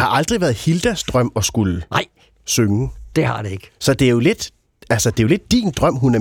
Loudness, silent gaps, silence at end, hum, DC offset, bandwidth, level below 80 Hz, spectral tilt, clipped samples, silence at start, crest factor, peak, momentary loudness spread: -18 LUFS; none; 0 s; none; under 0.1%; 18 kHz; -38 dBFS; -5 dB/octave; under 0.1%; 0 s; 16 dB; -2 dBFS; 8 LU